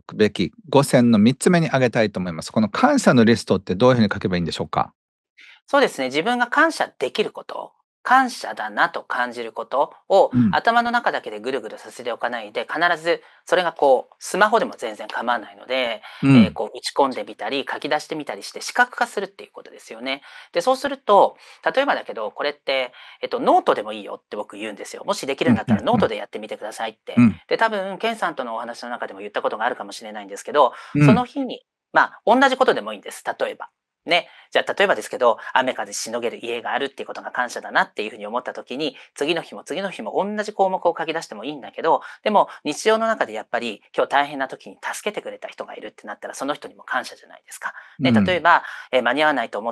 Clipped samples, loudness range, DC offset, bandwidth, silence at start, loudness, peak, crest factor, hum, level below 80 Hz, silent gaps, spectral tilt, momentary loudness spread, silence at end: under 0.1%; 6 LU; under 0.1%; 12.5 kHz; 0.1 s; -21 LUFS; 0 dBFS; 20 dB; none; -60 dBFS; 4.95-5.24 s, 5.30-5.36 s, 7.84-8.04 s; -5 dB/octave; 15 LU; 0 s